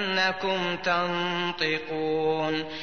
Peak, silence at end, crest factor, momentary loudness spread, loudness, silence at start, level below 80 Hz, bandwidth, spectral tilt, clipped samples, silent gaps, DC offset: -12 dBFS; 0 s; 16 dB; 4 LU; -26 LUFS; 0 s; -62 dBFS; 6.6 kHz; -4.5 dB/octave; under 0.1%; none; 0.4%